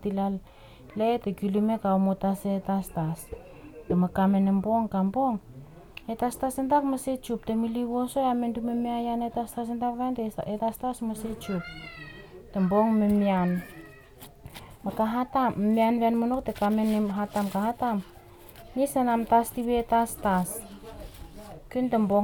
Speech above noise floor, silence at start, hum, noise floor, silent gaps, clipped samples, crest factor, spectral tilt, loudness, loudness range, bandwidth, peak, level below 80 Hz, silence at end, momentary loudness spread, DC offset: 23 dB; 0 s; none; -49 dBFS; none; under 0.1%; 16 dB; -7 dB/octave; -27 LUFS; 3 LU; 19.5 kHz; -10 dBFS; -52 dBFS; 0 s; 20 LU; under 0.1%